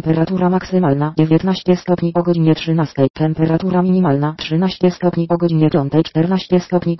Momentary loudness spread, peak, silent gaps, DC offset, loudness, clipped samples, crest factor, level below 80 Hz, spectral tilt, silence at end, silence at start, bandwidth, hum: 3 LU; -2 dBFS; 3.10-3.14 s; 0.3%; -16 LUFS; under 0.1%; 12 dB; -48 dBFS; -8.5 dB/octave; 0 s; 0.05 s; 6 kHz; none